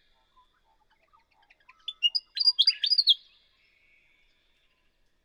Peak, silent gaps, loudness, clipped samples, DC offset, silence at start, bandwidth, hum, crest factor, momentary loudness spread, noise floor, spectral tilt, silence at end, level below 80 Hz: -10 dBFS; none; -23 LUFS; under 0.1%; under 0.1%; 1.9 s; 19.5 kHz; none; 22 dB; 12 LU; -69 dBFS; 4 dB/octave; 2.1 s; -74 dBFS